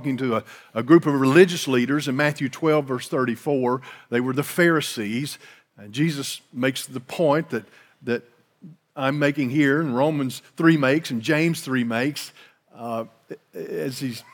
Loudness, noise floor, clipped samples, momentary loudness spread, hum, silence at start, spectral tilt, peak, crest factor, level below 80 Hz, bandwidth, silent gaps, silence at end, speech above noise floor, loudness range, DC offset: -22 LUFS; -48 dBFS; under 0.1%; 15 LU; none; 0 s; -5.5 dB/octave; -2 dBFS; 22 dB; -82 dBFS; 18.5 kHz; none; 0.15 s; 26 dB; 6 LU; under 0.1%